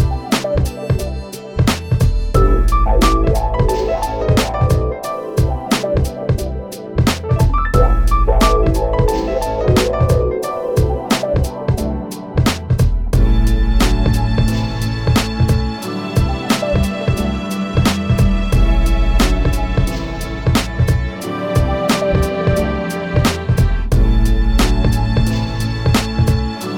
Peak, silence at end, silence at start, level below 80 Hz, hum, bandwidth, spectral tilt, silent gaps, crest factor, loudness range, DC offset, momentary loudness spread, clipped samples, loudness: 0 dBFS; 0 s; 0 s; -18 dBFS; none; 17 kHz; -6 dB/octave; none; 14 dB; 2 LU; under 0.1%; 5 LU; under 0.1%; -17 LUFS